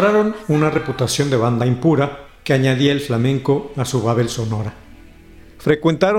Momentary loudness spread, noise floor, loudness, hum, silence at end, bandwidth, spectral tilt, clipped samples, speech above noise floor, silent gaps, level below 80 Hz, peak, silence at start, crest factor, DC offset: 8 LU; -42 dBFS; -18 LUFS; none; 0 s; 16 kHz; -6 dB/octave; under 0.1%; 25 dB; none; -46 dBFS; -4 dBFS; 0 s; 14 dB; under 0.1%